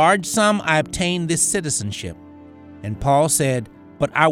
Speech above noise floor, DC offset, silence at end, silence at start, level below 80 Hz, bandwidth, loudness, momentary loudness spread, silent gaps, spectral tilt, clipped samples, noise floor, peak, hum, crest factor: 23 dB; under 0.1%; 0 s; 0 s; -44 dBFS; 19.5 kHz; -19 LUFS; 15 LU; none; -3.5 dB/octave; under 0.1%; -42 dBFS; 0 dBFS; none; 18 dB